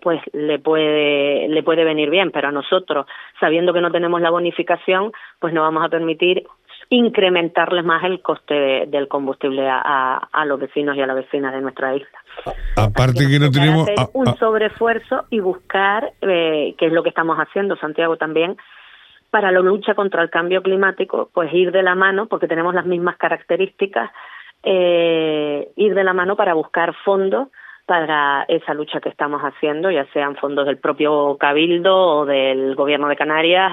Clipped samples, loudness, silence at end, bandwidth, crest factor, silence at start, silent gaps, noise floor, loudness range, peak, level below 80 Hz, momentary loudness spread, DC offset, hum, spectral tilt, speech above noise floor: under 0.1%; -17 LUFS; 0 s; 13.5 kHz; 16 dB; 0.05 s; none; -47 dBFS; 3 LU; 0 dBFS; -42 dBFS; 8 LU; under 0.1%; none; -6.5 dB/octave; 29 dB